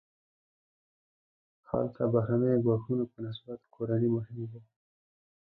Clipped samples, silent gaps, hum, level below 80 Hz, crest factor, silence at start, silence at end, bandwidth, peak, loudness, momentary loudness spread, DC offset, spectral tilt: under 0.1%; none; none; -64 dBFS; 20 dB; 1.7 s; 0.9 s; 4.5 kHz; -14 dBFS; -31 LUFS; 15 LU; under 0.1%; -12 dB/octave